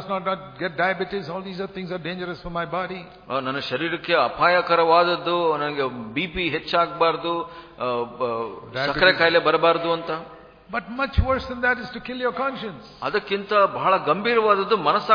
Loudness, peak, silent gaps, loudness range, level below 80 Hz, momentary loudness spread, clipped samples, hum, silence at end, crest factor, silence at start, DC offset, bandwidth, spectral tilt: -22 LUFS; -2 dBFS; none; 6 LU; -40 dBFS; 13 LU; under 0.1%; none; 0 s; 20 dB; 0 s; under 0.1%; 5.2 kHz; -6.5 dB/octave